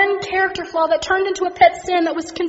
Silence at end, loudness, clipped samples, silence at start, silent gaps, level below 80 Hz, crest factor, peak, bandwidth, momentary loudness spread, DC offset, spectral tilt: 0 s; -18 LUFS; under 0.1%; 0 s; none; -50 dBFS; 18 dB; 0 dBFS; 8 kHz; 6 LU; under 0.1%; -1 dB/octave